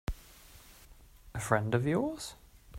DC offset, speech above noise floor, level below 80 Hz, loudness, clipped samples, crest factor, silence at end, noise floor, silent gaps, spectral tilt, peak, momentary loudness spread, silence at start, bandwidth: under 0.1%; 25 dB; -50 dBFS; -33 LUFS; under 0.1%; 24 dB; 0 s; -56 dBFS; none; -6 dB/octave; -12 dBFS; 25 LU; 0.1 s; 16 kHz